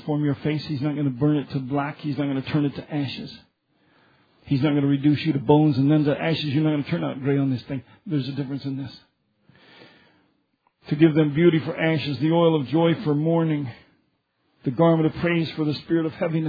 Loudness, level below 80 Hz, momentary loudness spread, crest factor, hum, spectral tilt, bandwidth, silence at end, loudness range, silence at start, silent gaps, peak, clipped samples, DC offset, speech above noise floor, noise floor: -23 LUFS; -60 dBFS; 11 LU; 20 dB; none; -9.5 dB/octave; 5 kHz; 0 s; 7 LU; 0.05 s; none; -4 dBFS; under 0.1%; under 0.1%; 48 dB; -70 dBFS